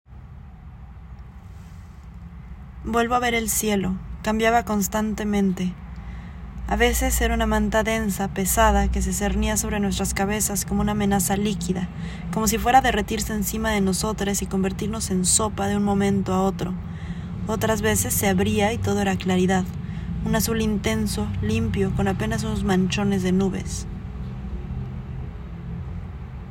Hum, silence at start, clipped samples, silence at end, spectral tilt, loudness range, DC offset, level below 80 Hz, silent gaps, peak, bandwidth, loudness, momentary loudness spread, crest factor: none; 0.1 s; under 0.1%; 0 s; -4.5 dB/octave; 4 LU; under 0.1%; -34 dBFS; none; -4 dBFS; 16.5 kHz; -23 LUFS; 18 LU; 18 dB